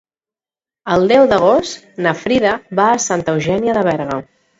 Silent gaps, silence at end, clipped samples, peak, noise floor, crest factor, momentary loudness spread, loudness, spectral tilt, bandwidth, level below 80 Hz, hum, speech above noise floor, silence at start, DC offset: none; 0.35 s; under 0.1%; 0 dBFS; under -90 dBFS; 16 dB; 11 LU; -15 LUFS; -4.5 dB/octave; 8 kHz; -48 dBFS; none; over 76 dB; 0.85 s; under 0.1%